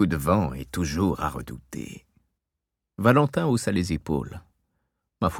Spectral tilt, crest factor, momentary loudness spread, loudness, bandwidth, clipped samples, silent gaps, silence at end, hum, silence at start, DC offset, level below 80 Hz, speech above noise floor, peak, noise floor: -6.5 dB/octave; 22 dB; 17 LU; -25 LUFS; 19 kHz; under 0.1%; none; 0 s; none; 0 s; under 0.1%; -44 dBFS; 60 dB; -4 dBFS; -85 dBFS